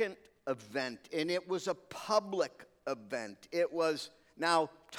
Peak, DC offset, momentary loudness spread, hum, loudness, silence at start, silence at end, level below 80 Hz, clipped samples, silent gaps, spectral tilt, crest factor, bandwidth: -16 dBFS; under 0.1%; 10 LU; none; -36 LUFS; 0 s; 0 s; -80 dBFS; under 0.1%; none; -3.5 dB/octave; 20 dB; 16.5 kHz